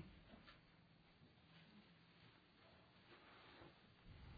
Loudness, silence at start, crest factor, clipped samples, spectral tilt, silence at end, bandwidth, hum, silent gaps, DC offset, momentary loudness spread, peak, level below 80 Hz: -67 LUFS; 0 s; 22 dB; under 0.1%; -4 dB/octave; 0 s; 4.8 kHz; none; none; under 0.1%; 5 LU; -44 dBFS; -74 dBFS